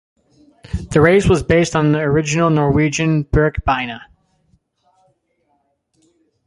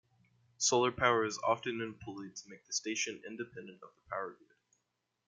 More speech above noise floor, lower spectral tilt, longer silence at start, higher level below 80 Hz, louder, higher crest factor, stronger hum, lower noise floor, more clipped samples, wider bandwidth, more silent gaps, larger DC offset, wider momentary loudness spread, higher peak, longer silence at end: about the same, 50 dB vs 48 dB; first, -6 dB/octave vs -2.5 dB/octave; about the same, 0.7 s vs 0.6 s; first, -34 dBFS vs -70 dBFS; first, -15 LUFS vs -34 LUFS; second, 16 dB vs 26 dB; neither; second, -65 dBFS vs -84 dBFS; neither; about the same, 11.5 kHz vs 10.5 kHz; neither; neither; second, 12 LU vs 17 LU; first, -2 dBFS vs -12 dBFS; first, 2.45 s vs 0.95 s